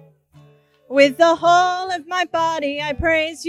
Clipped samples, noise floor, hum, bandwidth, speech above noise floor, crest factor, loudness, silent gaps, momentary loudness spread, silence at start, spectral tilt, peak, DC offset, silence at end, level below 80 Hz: under 0.1%; -52 dBFS; none; 13 kHz; 34 dB; 18 dB; -18 LUFS; none; 9 LU; 0.9 s; -3.5 dB/octave; -2 dBFS; under 0.1%; 0 s; -44 dBFS